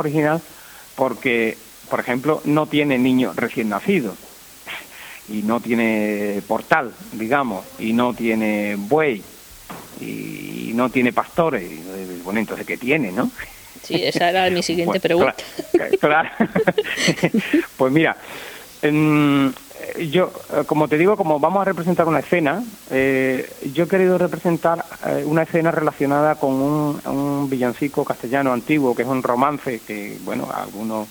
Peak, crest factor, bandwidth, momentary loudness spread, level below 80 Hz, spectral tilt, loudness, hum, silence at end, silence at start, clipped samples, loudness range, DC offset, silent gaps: 0 dBFS; 20 dB; over 20 kHz; 14 LU; -56 dBFS; -5.5 dB/octave; -20 LUFS; none; 0 s; 0 s; under 0.1%; 4 LU; under 0.1%; none